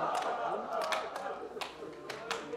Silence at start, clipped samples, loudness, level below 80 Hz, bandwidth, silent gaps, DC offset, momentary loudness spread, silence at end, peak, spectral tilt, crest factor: 0 s; under 0.1%; -37 LUFS; -72 dBFS; 17 kHz; none; under 0.1%; 9 LU; 0 s; -16 dBFS; -2.5 dB/octave; 20 dB